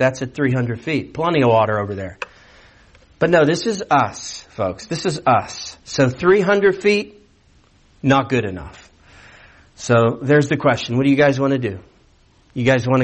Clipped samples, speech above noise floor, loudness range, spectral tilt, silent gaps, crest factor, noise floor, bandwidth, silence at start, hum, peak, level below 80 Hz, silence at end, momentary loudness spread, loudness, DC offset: under 0.1%; 36 dB; 3 LU; -6 dB/octave; none; 16 dB; -54 dBFS; 8.8 kHz; 0 s; none; -4 dBFS; -52 dBFS; 0 s; 16 LU; -18 LUFS; under 0.1%